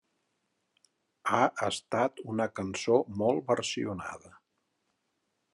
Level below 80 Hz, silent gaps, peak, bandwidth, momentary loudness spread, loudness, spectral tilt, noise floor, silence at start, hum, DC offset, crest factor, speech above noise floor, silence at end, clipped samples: -78 dBFS; none; -10 dBFS; 12 kHz; 10 LU; -30 LUFS; -4.5 dB/octave; -79 dBFS; 1.25 s; none; under 0.1%; 22 dB; 49 dB; 1.25 s; under 0.1%